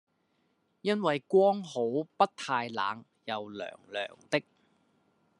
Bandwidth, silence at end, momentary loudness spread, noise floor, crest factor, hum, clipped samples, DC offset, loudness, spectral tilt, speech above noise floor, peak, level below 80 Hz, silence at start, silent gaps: 11 kHz; 1 s; 13 LU; -74 dBFS; 22 dB; none; under 0.1%; under 0.1%; -31 LUFS; -5.5 dB/octave; 44 dB; -10 dBFS; -86 dBFS; 0.85 s; none